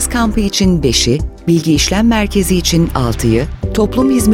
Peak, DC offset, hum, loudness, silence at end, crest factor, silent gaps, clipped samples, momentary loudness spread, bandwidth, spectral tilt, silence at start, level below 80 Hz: 0 dBFS; under 0.1%; none; -13 LUFS; 0 s; 12 dB; none; under 0.1%; 4 LU; 17 kHz; -5 dB/octave; 0 s; -22 dBFS